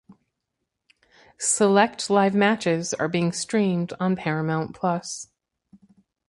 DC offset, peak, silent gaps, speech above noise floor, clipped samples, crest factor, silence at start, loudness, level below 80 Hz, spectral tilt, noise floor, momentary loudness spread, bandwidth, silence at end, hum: under 0.1%; -4 dBFS; none; 58 dB; under 0.1%; 22 dB; 0.1 s; -23 LUFS; -66 dBFS; -4.5 dB/octave; -81 dBFS; 8 LU; 11.5 kHz; 1.05 s; none